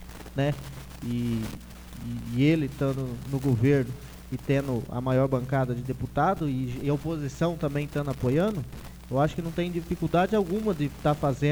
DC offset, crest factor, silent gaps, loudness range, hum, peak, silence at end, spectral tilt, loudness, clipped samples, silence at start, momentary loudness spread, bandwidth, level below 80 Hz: under 0.1%; 16 dB; none; 2 LU; none; -10 dBFS; 0 s; -7.5 dB/octave; -28 LUFS; under 0.1%; 0 s; 12 LU; over 20 kHz; -46 dBFS